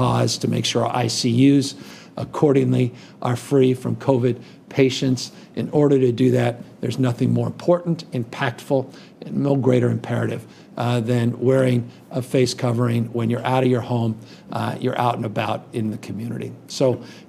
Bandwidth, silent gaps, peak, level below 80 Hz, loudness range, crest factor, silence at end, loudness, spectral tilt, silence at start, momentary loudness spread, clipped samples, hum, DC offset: 14 kHz; none; -4 dBFS; -62 dBFS; 3 LU; 18 dB; 0.1 s; -21 LUFS; -6.5 dB/octave; 0 s; 12 LU; under 0.1%; none; under 0.1%